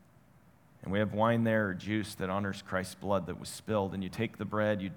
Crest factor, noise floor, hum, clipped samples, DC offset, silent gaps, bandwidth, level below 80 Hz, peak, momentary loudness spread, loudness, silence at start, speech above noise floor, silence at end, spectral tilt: 20 dB; -62 dBFS; none; under 0.1%; under 0.1%; none; 19 kHz; -68 dBFS; -14 dBFS; 8 LU; -33 LUFS; 0.8 s; 30 dB; 0 s; -6 dB/octave